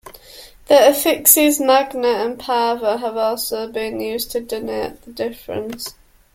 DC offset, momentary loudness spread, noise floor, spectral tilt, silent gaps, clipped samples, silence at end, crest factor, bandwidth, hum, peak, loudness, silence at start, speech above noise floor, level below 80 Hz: under 0.1%; 16 LU; -42 dBFS; -2 dB/octave; none; under 0.1%; 0.45 s; 18 dB; 16.5 kHz; none; 0 dBFS; -17 LUFS; 0.05 s; 24 dB; -52 dBFS